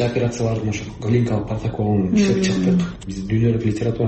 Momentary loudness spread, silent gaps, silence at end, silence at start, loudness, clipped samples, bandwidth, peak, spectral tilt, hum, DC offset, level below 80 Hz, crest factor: 8 LU; none; 0 s; 0 s; -20 LUFS; under 0.1%; 8.6 kHz; -6 dBFS; -7 dB/octave; none; under 0.1%; -40 dBFS; 12 dB